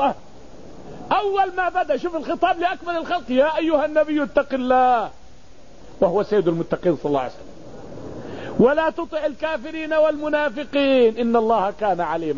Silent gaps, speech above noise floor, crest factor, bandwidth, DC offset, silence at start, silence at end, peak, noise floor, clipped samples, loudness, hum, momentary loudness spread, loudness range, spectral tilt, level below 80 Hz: none; 28 dB; 16 dB; 7.4 kHz; 1%; 0 s; 0 s; -4 dBFS; -48 dBFS; under 0.1%; -21 LUFS; none; 15 LU; 3 LU; -6.5 dB/octave; -50 dBFS